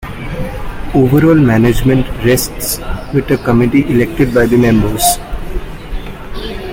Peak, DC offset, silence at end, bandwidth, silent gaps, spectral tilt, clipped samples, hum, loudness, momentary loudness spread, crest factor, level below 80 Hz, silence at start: 0 dBFS; under 0.1%; 0 s; 17 kHz; none; -5.5 dB/octave; under 0.1%; none; -12 LUFS; 17 LU; 12 dB; -24 dBFS; 0 s